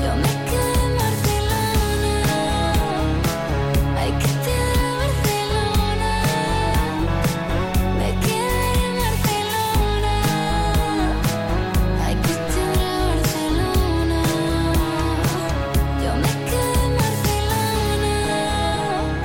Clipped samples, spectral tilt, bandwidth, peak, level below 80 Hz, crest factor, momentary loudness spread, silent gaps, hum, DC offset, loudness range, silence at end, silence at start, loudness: under 0.1%; -5 dB/octave; 17 kHz; -8 dBFS; -26 dBFS; 10 dB; 2 LU; none; none; under 0.1%; 0 LU; 0 s; 0 s; -21 LUFS